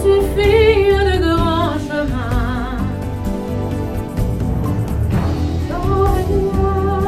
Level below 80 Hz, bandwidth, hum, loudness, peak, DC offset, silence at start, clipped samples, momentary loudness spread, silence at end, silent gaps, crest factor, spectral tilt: -24 dBFS; 15.5 kHz; none; -17 LUFS; 0 dBFS; 0.1%; 0 s; under 0.1%; 10 LU; 0 s; none; 16 dB; -7 dB/octave